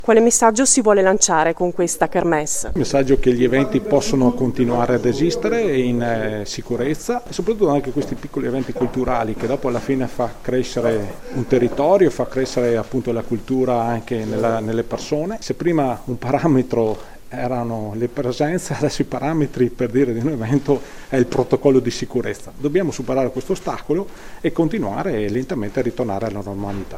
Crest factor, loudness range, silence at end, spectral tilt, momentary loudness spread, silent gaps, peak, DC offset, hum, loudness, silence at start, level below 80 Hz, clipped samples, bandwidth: 18 dB; 4 LU; 0 s; -5 dB/octave; 9 LU; none; 0 dBFS; under 0.1%; none; -19 LUFS; 0 s; -38 dBFS; under 0.1%; 16 kHz